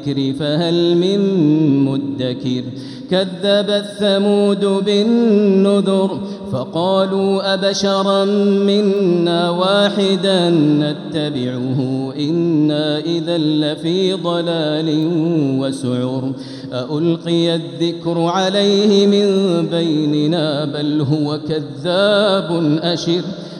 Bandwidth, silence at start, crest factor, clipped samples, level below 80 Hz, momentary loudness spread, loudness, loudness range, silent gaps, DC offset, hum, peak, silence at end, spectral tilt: 11 kHz; 0 s; 14 dB; under 0.1%; -60 dBFS; 8 LU; -16 LUFS; 3 LU; none; under 0.1%; none; -2 dBFS; 0 s; -6.5 dB/octave